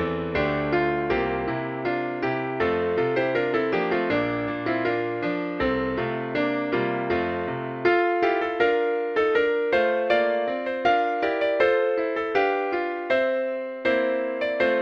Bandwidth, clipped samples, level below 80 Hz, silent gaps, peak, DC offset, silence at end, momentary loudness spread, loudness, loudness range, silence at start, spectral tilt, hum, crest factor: 6.6 kHz; under 0.1%; -50 dBFS; none; -6 dBFS; under 0.1%; 0 s; 5 LU; -24 LUFS; 3 LU; 0 s; -7.5 dB/octave; none; 18 dB